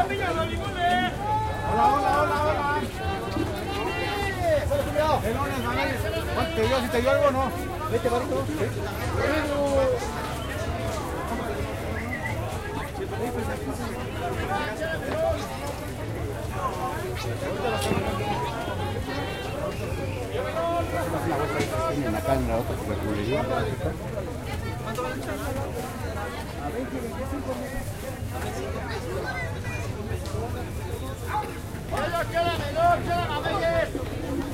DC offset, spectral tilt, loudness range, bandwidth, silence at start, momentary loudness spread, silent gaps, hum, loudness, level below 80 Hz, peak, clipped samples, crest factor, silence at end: under 0.1%; -5.5 dB/octave; 7 LU; 16 kHz; 0 s; 8 LU; none; none; -27 LUFS; -38 dBFS; -10 dBFS; under 0.1%; 18 dB; 0 s